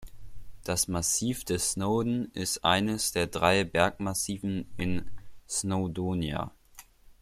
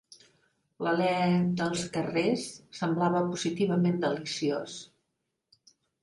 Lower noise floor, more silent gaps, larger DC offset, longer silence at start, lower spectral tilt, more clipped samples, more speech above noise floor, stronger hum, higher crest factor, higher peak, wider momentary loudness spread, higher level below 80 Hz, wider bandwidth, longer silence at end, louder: second, -54 dBFS vs -82 dBFS; neither; neither; second, 0 s vs 0.8 s; second, -3.5 dB/octave vs -5.5 dB/octave; neither; second, 25 dB vs 53 dB; neither; first, 22 dB vs 16 dB; first, -8 dBFS vs -14 dBFS; about the same, 8 LU vs 9 LU; first, -50 dBFS vs -68 dBFS; first, 16 kHz vs 11.5 kHz; second, 0.1 s vs 1.2 s; about the same, -29 LUFS vs -29 LUFS